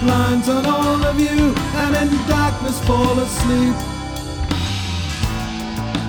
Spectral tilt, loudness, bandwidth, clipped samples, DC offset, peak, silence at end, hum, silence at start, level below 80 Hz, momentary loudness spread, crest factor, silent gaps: -5.5 dB/octave; -18 LUFS; 20 kHz; under 0.1%; under 0.1%; -2 dBFS; 0 s; none; 0 s; -28 dBFS; 8 LU; 16 dB; none